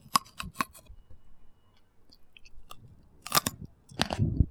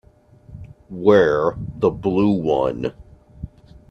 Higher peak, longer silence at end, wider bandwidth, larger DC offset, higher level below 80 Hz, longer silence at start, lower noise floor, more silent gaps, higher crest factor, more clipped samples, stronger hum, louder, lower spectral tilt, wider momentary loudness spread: second, -4 dBFS vs 0 dBFS; second, 0 s vs 0.45 s; first, over 20 kHz vs 6.8 kHz; neither; about the same, -42 dBFS vs -46 dBFS; second, 0.05 s vs 0.5 s; first, -59 dBFS vs -49 dBFS; neither; first, 30 dB vs 20 dB; neither; neither; second, -31 LUFS vs -19 LUFS; second, -3.5 dB/octave vs -8 dB/octave; about the same, 25 LU vs 24 LU